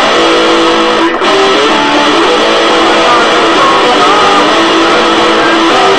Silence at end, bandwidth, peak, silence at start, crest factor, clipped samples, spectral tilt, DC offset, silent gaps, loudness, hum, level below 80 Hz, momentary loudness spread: 0 s; 11.5 kHz; 0 dBFS; 0 s; 6 dB; 1%; -2.5 dB/octave; 2%; none; -6 LUFS; none; -40 dBFS; 1 LU